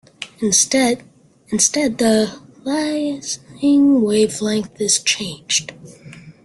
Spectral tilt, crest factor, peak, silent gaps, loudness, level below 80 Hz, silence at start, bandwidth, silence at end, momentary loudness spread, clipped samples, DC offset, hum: -2.5 dB/octave; 18 dB; -2 dBFS; none; -17 LUFS; -58 dBFS; 0.2 s; 12.5 kHz; 0.15 s; 12 LU; under 0.1%; under 0.1%; none